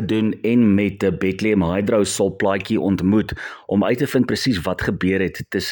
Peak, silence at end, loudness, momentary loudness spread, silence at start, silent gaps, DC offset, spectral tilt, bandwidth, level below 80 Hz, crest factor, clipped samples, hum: -4 dBFS; 0 s; -19 LUFS; 5 LU; 0 s; none; under 0.1%; -6 dB/octave; 17.5 kHz; -46 dBFS; 14 dB; under 0.1%; none